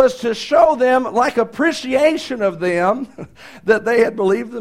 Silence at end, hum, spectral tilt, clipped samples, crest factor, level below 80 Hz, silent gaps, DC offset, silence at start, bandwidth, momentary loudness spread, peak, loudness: 0 s; none; -5 dB/octave; under 0.1%; 16 dB; -52 dBFS; none; 0.3%; 0 s; 14.5 kHz; 10 LU; 0 dBFS; -17 LUFS